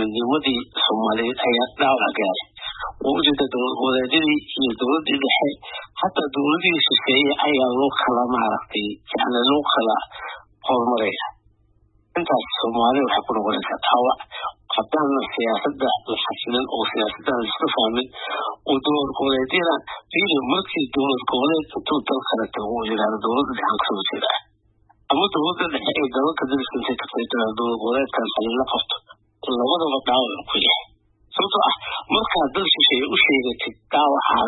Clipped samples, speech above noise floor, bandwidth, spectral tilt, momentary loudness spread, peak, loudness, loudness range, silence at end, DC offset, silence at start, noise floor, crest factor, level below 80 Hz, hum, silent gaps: under 0.1%; 38 dB; 4.1 kHz; -9 dB/octave; 8 LU; -4 dBFS; -21 LUFS; 4 LU; 0 s; under 0.1%; 0 s; -59 dBFS; 18 dB; -56 dBFS; none; none